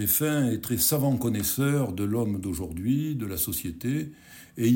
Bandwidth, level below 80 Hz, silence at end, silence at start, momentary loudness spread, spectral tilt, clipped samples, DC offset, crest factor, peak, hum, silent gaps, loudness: 17 kHz; -50 dBFS; 0 s; 0 s; 8 LU; -5 dB/octave; under 0.1%; under 0.1%; 16 dB; -10 dBFS; none; none; -26 LUFS